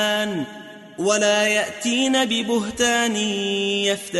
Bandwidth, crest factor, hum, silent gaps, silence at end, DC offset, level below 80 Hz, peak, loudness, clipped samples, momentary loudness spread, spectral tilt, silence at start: 12 kHz; 16 dB; none; none; 0 s; under 0.1%; -58 dBFS; -6 dBFS; -20 LUFS; under 0.1%; 9 LU; -2.5 dB/octave; 0 s